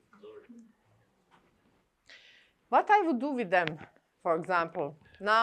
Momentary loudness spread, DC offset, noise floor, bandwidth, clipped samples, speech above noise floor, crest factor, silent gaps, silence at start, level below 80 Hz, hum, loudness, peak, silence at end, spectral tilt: 17 LU; under 0.1%; -70 dBFS; 9.8 kHz; under 0.1%; 41 dB; 22 dB; none; 0.25 s; -78 dBFS; none; -29 LUFS; -10 dBFS; 0 s; -5.5 dB/octave